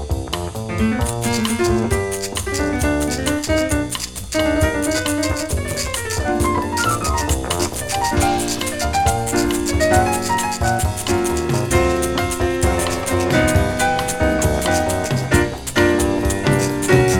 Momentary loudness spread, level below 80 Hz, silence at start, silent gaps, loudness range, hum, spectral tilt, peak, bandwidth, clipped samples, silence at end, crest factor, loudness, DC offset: 5 LU; -28 dBFS; 0 s; none; 2 LU; none; -4.5 dB/octave; -2 dBFS; over 20 kHz; under 0.1%; 0 s; 16 dB; -19 LUFS; under 0.1%